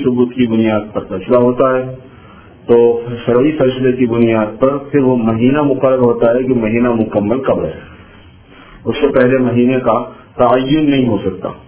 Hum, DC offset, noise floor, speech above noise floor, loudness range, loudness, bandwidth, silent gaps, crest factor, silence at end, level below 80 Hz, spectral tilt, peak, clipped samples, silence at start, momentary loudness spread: none; 0.2%; -40 dBFS; 27 dB; 3 LU; -13 LUFS; 4 kHz; none; 14 dB; 0.05 s; -42 dBFS; -11.5 dB/octave; 0 dBFS; under 0.1%; 0 s; 10 LU